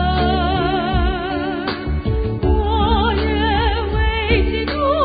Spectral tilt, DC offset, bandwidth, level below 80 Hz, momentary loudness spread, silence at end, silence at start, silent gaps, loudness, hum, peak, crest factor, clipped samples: -11.5 dB/octave; under 0.1%; 5 kHz; -22 dBFS; 5 LU; 0 s; 0 s; none; -18 LUFS; none; -4 dBFS; 14 dB; under 0.1%